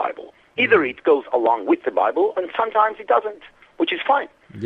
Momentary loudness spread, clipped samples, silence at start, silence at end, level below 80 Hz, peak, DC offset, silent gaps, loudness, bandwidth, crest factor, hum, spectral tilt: 11 LU; under 0.1%; 0 s; 0 s; -64 dBFS; -2 dBFS; under 0.1%; none; -20 LUFS; 4.8 kHz; 20 dB; none; -6.5 dB/octave